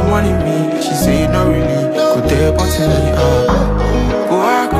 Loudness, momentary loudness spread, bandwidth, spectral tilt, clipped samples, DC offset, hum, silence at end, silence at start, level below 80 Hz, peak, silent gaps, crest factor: -14 LUFS; 2 LU; 15.5 kHz; -6 dB/octave; under 0.1%; under 0.1%; none; 0 s; 0 s; -22 dBFS; 0 dBFS; none; 12 dB